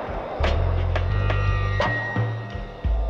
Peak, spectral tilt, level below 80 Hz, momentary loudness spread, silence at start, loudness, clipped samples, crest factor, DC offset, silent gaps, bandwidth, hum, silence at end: -10 dBFS; -7 dB/octave; -28 dBFS; 8 LU; 0 s; -25 LUFS; under 0.1%; 14 dB; under 0.1%; none; 7 kHz; none; 0 s